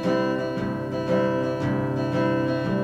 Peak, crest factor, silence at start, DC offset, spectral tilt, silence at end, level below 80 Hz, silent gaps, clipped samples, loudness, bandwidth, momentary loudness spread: -12 dBFS; 12 dB; 0 s; under 0.1%; -8 dB/octave; 0 s; -52 dBFS; none; under 0.1%; -25 LUFS; 9.8 kHz; 5 LU